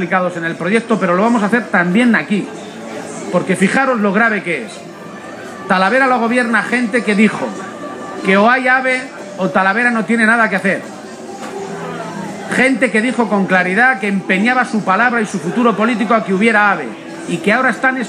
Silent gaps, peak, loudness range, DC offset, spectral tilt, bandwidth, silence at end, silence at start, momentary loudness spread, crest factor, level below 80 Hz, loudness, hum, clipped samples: none; 0 dBFS; 3 LU; under 0.1%; -5.5 dB/octave; 12 kHz; 0 s; 0 s; 15 LU; 14 dB; -64 dBFS; -14 LUFS; none; under 0.1%